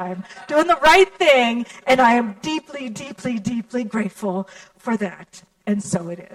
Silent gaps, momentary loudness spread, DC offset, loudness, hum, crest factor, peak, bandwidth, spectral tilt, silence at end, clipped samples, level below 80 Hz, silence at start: none; 17 LU; under 0.1%; -19 LUFS; none; 18 dB; -2 dBFS; 16 kHz; -4.5 dB/octave; 0.1 s; under 0.1%; -52 dBFS; 0 s